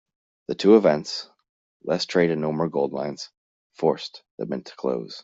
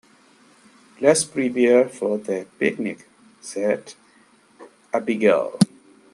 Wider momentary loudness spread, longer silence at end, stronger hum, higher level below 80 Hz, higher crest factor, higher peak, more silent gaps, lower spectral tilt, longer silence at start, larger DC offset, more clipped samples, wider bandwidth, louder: first, 20 LU vs 13 LU; second, 0.05 s vs 0.5 s; neither; about the same, -66 dBFS vs -68 dBFS; about the same, 20 dB vs 20 dB; about the same, -4 dBFS vs -2 dBFS; first, 1.49-1.80 s, 3.37-3.70 s, 4.31-4.38 s vs none; about the same, -6 dB/octave vs -5 dB/octave; second, 0.5 s vs 1 s; neither; neither; second, 7.8 kHz vs 12.5 kHz; about the same, -23 LUFS vs -21 LUFS